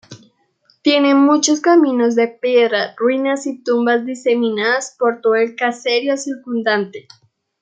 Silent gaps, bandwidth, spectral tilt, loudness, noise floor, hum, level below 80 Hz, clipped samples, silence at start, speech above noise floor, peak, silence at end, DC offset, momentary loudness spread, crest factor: none; 9.2 kHz; -3 dB/octave; -16 LUFS; -59 dBFS; none; -72 dBFS; under 0.1%; 0.1 s; 43 dB; -2 dBFS; 0.6 s; under 0.1%; 8 LU; 16 dB